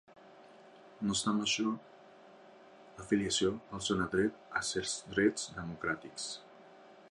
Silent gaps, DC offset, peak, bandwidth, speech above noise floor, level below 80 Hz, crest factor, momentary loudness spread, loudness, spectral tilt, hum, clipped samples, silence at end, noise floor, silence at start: none; under 0.1%; -16 dBFS; 11.5 kHz; 23 dB; -62 dBFS; 20 dB; 10 LU; -34 LUFS; -3.5 dB/octave; none; under 0.1%; 0 s; -57 dBFS; 0.1 s